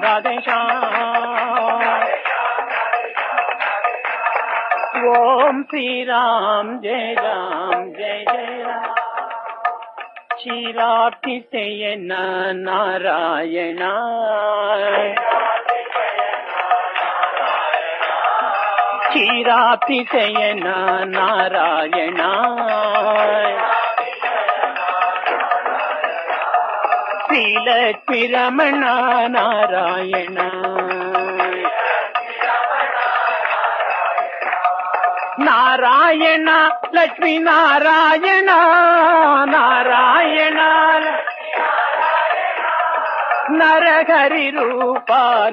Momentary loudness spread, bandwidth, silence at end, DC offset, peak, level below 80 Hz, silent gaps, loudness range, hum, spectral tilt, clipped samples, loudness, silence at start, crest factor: 9 LU; 6 kHz; 0 s; under 0.1%; -2 dBFS; -84 dBFS; none; 8 LU; none; -5 dB/octave; under 0.1%; -16 LUFS; 0 s; 14 dB